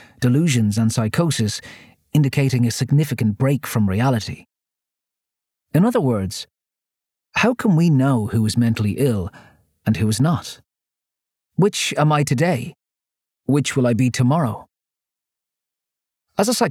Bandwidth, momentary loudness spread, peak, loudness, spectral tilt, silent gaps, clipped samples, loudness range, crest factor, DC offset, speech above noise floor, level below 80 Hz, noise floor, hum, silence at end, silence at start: 16.5 kHz; 11 LU; -4 dBFS; -19 LUFS; -6 dB/octave; none; under 0.1%; 3 LU; 16 dB; under 0.1%; 69 dB; -54 dBFS; -87 dBFS; none; 0 s; 0.2 s